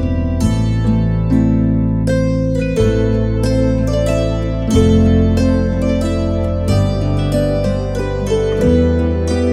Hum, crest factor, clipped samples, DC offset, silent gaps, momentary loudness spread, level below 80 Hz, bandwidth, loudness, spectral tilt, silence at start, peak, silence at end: none; 14 dB; under 0.1%; under 0.1%; none; 5 LU; -22 dBFS; 12 kHz; -15 LUFS; -7.5 dB/octave; 0 s; 0 dBFS; 0 s